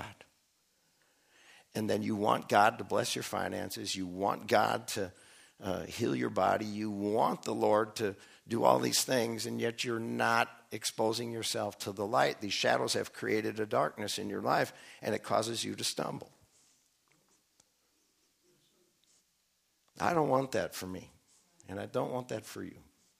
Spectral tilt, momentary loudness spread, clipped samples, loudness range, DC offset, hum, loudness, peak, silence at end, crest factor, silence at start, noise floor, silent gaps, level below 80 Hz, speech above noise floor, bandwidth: -4 dB/octave; 11 LU; under 0.1%; 6 LU; under 0.1%; none; -33 LUFS; -10 dBFS; 0.4 s; 24 dB; 0 s; -76 dBFS; none; -74 dBFS; 43 dB; 15.5 kHz